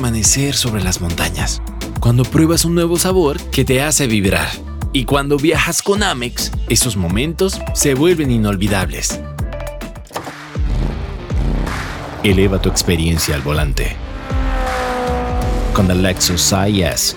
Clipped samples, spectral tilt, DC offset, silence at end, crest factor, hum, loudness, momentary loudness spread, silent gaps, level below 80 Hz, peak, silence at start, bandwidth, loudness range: under 0.1%; -4 dB/octave; under 0.1%; 0 s; 14 dB; none; -16 LUFS; 11 LU; none; -24 dBFS; -2 dBFS; 0 s; over 20 kHz; 5 LU